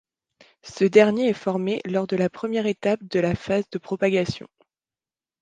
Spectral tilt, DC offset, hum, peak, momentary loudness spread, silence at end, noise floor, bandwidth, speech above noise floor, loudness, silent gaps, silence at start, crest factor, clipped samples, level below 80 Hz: -6.5 dB/octave; under 0.1%; none; -2 dBFS; 9 LU; 1.05 s; under -90 dBFS; 9.4 kHz; over 68 dB; -23 LUFS; none; 0.65 s; 20 dB; under 0.1%; -56 dBFS